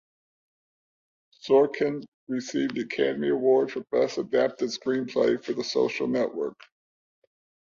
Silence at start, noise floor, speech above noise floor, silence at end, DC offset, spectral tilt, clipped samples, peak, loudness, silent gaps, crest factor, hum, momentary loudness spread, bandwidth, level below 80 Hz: 1.45 s; under -90 dBFS; over 65 dB; 1.1 s; under 0.1%; -5 dB/octave; under 0.1%; -10 dBFS; -26 LUFS; 2.08-2.27 s; 18 dB; none; 10 LU; 7.4 kHz; -70 dBFS